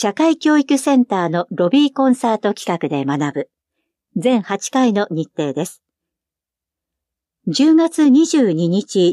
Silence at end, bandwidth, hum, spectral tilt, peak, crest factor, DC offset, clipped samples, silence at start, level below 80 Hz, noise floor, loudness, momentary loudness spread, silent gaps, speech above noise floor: 0 s; 13 kHz; none; -5.5 dB/octave; -4 dBFS; 14 dB; under 0.1%; under 0.1%; 0 s; -74 dBFS; -86 dBFS; -16 LUFS; 10 LU; none; 71 dB